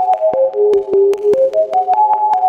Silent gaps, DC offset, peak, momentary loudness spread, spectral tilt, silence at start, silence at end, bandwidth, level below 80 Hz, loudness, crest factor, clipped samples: none; under 0.1%; -4 dBFS; 2 LU; -6 dB/octave; 0 s; 0 s; 7.4 kHz; -58 dBFS; -13 LUFS; 8 dB; under 0.1%